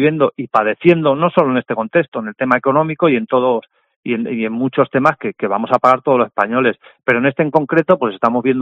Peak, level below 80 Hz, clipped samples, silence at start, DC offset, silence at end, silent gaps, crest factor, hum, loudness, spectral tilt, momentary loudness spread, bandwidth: 0 dBFS; -60 dBFS; under 0.1%; 0 s; under 0.1%; 0 s; 2.08-2.12 s, 3.96-4.03 s; 16 dB; none; -15 LUFS; -8.5 dB/octave; 7 LU; 7.4 kHz